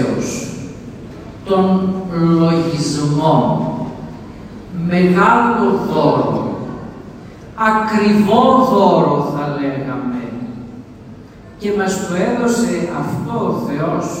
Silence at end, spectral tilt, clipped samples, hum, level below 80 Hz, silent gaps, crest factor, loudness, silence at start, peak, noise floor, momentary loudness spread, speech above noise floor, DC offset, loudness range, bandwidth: 0 s; -6.5 dB/octave; under 0.1%; none; -46 dBFS; none; 16 dB; -15 LUFS; 0 s; 0 dBFS; -36 dBFS; 21 LU; 22 dB; under 0.1%; 6 LU; 15.5 kHz